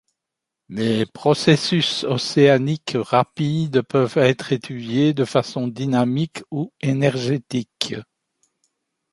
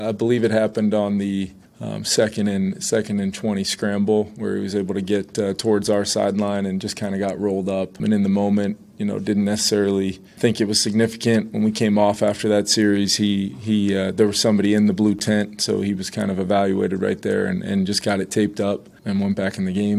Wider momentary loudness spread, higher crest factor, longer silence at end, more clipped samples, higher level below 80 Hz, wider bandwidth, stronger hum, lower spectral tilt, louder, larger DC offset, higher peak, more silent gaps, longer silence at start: first, 10 LU vs 7 LU; about the same, 20 dB vs 18 dB; first, 1.1 s vs 0 s; neither; about the same, -60 dBFS vs -58 dBFS; second, 11.5 kHz vs 14.5 kHz; neither; about the same, -6 dB/octave vs -5 dB/octave; about the same, -20 LUFS vs -21 LUFS; neither; first, 0 dBFS vs -4 dBFS; neither; first, 0.7 s vs 0 s